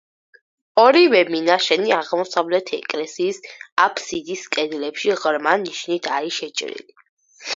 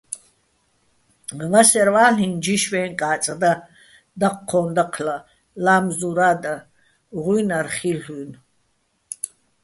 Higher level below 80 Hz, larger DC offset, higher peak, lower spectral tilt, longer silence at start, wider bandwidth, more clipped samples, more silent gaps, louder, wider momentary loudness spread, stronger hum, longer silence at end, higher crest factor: second, -70 dBFS vs -60 dBFS; neither; about the same, 0 dBFS vs -2 dBFS; about the same, -3 dB/octave vs -4 dB/octave; first, 0.75 s vs 0.1 s; second, 7.8 kHz vs 12 kHz; neither; first, 3.72-3.77 s, 7.09-7.17 s vs none; about the same, -19 LUFS vs -19 LUFS; second, 13 LU vs 20 LU; neither; second, 0 s vs 0.35 s; about the same, 20 dB vs 20 dB